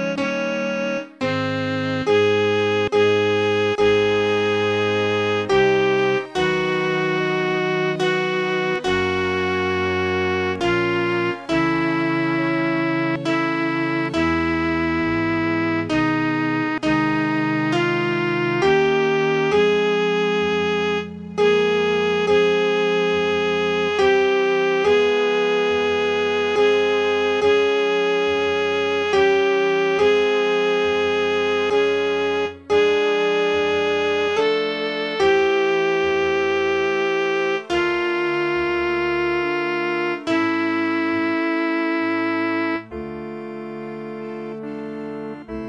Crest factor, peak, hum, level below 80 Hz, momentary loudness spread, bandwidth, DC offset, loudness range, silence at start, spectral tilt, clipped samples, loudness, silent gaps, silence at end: 14 dB; -6 dBFS; none; -50 dBFS; 6 LU; 8.8 kHz; under 0.1%; 3 LU; 0 s; -5.5 dB/octave; under 0.1%; -20 LUFS; none; 0 s